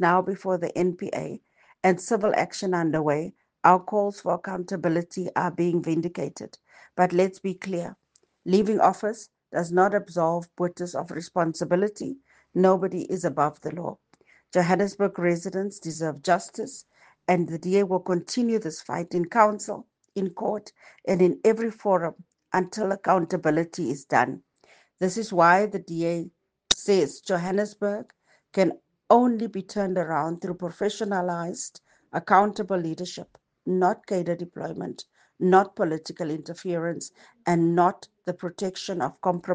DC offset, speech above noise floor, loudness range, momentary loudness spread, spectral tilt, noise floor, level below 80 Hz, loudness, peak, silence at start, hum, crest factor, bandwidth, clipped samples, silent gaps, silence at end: under 0.1%; 36 dB; 3 LU; 14 LU; -5.5 dB/octave; -61 dBFS; -66 dBFS; -25 LUFS; 0 dBFS; 0 s; none; 26 dB; 9.8 kHz; under 0.1%; none; 0 s